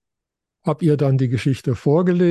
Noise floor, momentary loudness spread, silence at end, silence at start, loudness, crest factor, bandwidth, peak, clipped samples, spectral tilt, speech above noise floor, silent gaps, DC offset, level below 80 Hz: -83 dBFS; 6 LU; 0 s; 0.65 s; -19 LUFS; 14 dB; 12 kHz; -6 dBFS; under 0.1%; -8.5 dB/octave; 66 dB; none; under 0.1%; -50 dBFS